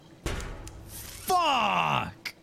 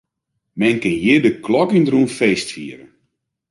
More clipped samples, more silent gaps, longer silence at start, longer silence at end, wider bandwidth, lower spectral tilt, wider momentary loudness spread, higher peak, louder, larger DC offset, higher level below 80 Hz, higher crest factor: neither; neither; second, 0.1 s vs 0.55 s; second, 0.1 s vs 0.75 s; first, 16 kHz vs 11.5 kHz; second, -3.5 dB/octave vs -5.5 dB/octave; about the same, 18 LU vs 16 LU; second, -12 dBFS vs -2 dBFS; second, -27 LUFS vs -16 LUFS; neither; first, -44 dBFS vs -54 dBFS; about the same, 16 dB vs 16 dB